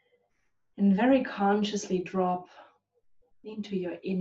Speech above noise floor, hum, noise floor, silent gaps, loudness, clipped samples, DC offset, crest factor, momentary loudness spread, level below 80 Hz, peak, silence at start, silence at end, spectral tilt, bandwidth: 49 dB; none; -77 dBFS; none; -28 LUFS; under 0.1%; under 0.1%; 18 dB; 12 LU; -70 dBFS; -12 dBFS; 0.75 s; 0 s; -6.5 dB/octave; 8 kHz